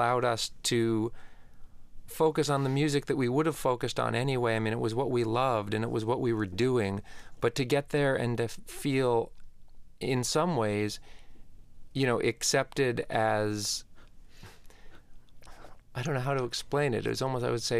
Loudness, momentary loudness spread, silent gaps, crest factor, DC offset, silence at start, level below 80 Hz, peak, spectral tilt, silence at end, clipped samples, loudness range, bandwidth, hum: -30 LUFS; 6 LU; none; 18 dB; under 0.1%; 0 s; -52 dBFS; -12 dBFS; -5 dB/octave; 0 s; under 0.1%; 5 LU; 15.5 kHz; none